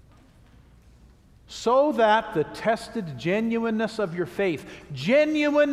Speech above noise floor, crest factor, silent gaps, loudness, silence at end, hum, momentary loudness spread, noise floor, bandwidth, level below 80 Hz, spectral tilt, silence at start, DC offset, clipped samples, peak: 30 dB; 18 dB; none; -24 LUFS; 0 s; none; 11 LU; -53 dBFS; 13.5 kHz; -56 dBFS; -5.5 dB/octave; 1.5 s; under 0.1%; under 0.1%; -8 dBFS